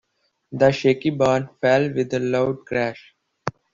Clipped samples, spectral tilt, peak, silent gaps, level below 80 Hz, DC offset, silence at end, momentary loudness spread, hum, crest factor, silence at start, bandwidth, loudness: under 0.1%; -6.5 dB/octave; -4 dBFS; none; -58 dBFS; under 0.1%; 0.25 s; 15 LU; none; 18 dB; 0.5 s; 7.6 kHz; -21 LUFS